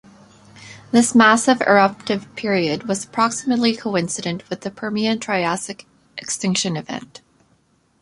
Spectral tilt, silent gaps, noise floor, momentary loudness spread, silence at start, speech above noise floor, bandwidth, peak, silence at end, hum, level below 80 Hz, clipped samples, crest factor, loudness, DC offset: -4 dB/octave; none; -61 dBFS; 17 LU; 0.55 s; 42 dB; 11.5 kHz; -2 dBFS; 0.95 s; none; -60 dBFS; under 0.1%; 18 dB; -19 LUFS; under 0.1%